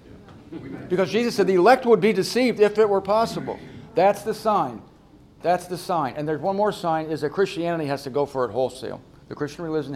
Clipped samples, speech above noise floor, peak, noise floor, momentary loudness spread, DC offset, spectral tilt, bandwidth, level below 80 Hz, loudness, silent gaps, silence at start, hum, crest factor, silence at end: under 0.1%; 29 dB; -2 dBFS; -51 dBFS; 17 LU; under 0.1%; -5.5 dB/octave; 15.5 kHz; -58 dBFS; -22 LUFS; none; 0.1 s; none; 20 dB; 0 s